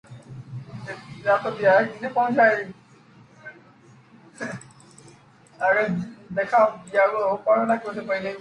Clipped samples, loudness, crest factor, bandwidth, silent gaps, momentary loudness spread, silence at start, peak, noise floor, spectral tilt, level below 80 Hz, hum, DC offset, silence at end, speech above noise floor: under 0.1%; -22 LUFS; 18 dB; 10.5 kHz; none; 20 LU; 0.1 s; -6 dBFS; -52 dBFS; -6.5 dB/octave; -66 dBFS; none; under 0.1%; 0 s; 30 dB